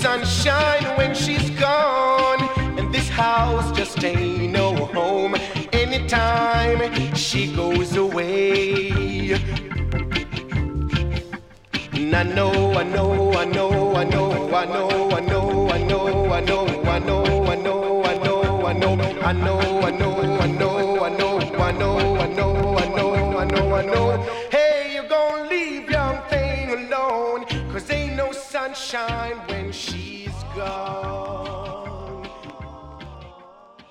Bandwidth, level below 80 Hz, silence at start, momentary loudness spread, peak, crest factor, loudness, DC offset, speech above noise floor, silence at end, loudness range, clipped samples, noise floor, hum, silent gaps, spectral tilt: 13.5 kHz; -34 dBFS; 0 s; 10 LU; -4 dBFS; 16 dB; -21 LUFS; under 0.1%; 27 dB; 0.1 s; 7 LU; under 0.1%; -47 dBFS; none; none; -5.5 dB/octave